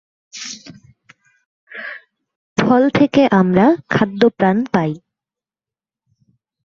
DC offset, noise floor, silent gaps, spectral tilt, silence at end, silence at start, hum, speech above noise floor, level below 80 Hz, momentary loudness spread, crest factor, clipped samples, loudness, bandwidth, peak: under 0.1%; under -90 dBFS; 1.46-1.67 s, 2.36-2.56 s; -6.5 dB/octave; 1.7 s; 0.35 s; none; over 76 dB; -54 dBFS; 20 LU; 16 dB; under 0.1%; -15 LUFS; 7.6 kHz; -2 dBFS